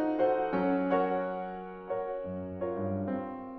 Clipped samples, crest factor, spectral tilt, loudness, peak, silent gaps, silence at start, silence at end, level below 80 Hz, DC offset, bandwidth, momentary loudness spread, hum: under 0.1%; 16 dB; -10 dB/octave; -32 LUFS; -16 dBFS; none; 0 s; 0 s; -62 dBFS; under 0.1%; 4.9 kHz; 10 LU; none